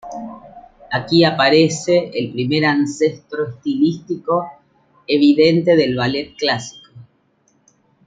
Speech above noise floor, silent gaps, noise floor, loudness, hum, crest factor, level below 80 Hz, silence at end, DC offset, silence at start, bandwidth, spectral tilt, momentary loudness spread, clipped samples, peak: 44 dB; none; -60 dBFS; -17 LUFS; none; 16 dB; -56 dBFS; 1.05 s; under 0.1%; 0.05 s; 9.2 kHz; -5.5 dB/octave; 13 LU; under 0.1%; -2 dBFS